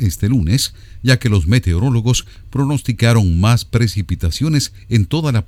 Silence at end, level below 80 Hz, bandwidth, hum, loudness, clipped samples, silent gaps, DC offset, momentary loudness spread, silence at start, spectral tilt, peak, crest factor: 0.05 s; -30 dBFS; 15.5 kHz; none; -16 LUFS; under 0.1%; none; under 0.1%; 7 LU; 0 s; -5.5 dB/octave; 0 dBFS; 14 dB